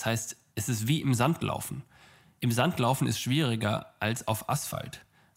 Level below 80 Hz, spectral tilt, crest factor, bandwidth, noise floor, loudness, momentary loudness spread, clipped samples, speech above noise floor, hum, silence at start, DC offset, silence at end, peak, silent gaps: -62 dBFS; -5 dB/octave; 20 dB; 16 kHz; -58 dBFS; -29 LUFS; 11 LU; under 0.1%; 29 dB; none; 0 s; under 0.1%; 0.35 s; -10 dBFS; none